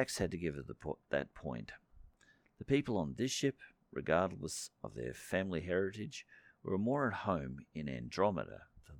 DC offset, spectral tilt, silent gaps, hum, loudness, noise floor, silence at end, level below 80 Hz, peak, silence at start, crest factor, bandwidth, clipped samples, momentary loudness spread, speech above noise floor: under 0.1%; -5 dB/octave; none; none; -38 LUFS; -70 dBFS; 0 s; -60 dBFS; -18 dBFS; 0 s; 20 dB; 19 kHz; under 0.1%; 14 LU; 32 dB